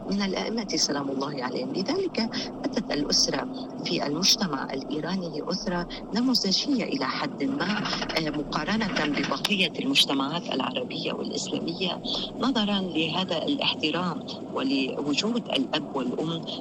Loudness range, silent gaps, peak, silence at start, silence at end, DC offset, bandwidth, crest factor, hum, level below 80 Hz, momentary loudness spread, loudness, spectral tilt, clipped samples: 2 LU; none; -10 dBFS; 0 s; 0 s; under 0.1%; 14 kHz; 16 dB; none; -54 dBFS; 8 LU; -26 LUFS; -3.5 dB/octave; under 0.1%